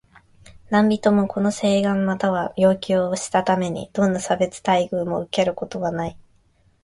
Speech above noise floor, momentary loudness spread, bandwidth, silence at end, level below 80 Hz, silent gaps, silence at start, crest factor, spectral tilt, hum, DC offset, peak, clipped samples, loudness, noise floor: 39 dB; 7 LU; 11.5 kHz; 0.65 s; -54 dBFS; none; 0.5 s; 16 dB; -5.5 dB/octave; none; under 0.1%; -4 dBFS; under 0.1%; -21 LUFS; -59 dBFS